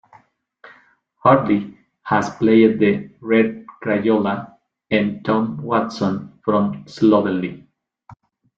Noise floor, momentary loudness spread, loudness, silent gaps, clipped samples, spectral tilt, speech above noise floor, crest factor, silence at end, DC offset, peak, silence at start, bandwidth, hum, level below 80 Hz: -55 dBFS; 11 LU; -19 LUFS; none; under 0.1%; -7.5 dB/octave; 38 dB; 18 dB; 0.45 s; under 0.1%; -2 dBFS; 1.25 s; 7.6 kHz; none; -58 dBFS